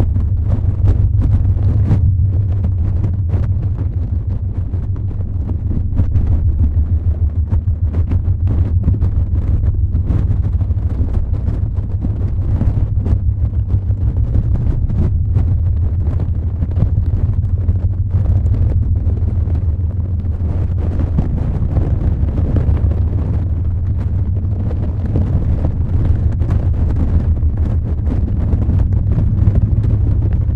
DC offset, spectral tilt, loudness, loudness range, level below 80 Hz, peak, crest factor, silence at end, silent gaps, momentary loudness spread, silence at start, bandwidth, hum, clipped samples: under 0.1%; -11.5 dB/octave; -17 LUFS; 2 LU; -18 dBFS; -2 dBFS; 14 dB; 0 s; none; 4 LU; 0 s; 2.8 kHz; none; under 0.1%